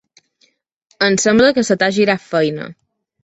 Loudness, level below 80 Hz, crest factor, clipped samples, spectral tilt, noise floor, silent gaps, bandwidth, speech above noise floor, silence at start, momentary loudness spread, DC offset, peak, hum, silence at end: -15 LUFS; -54 dBFS; 16 dB; under 0.1%; -4 dB/octave; -60 dBFS; none; 8.2 kHz; 46 dB; 1 s; 9 LU; under 0.1%; -2 dBFS; none; 0.5 s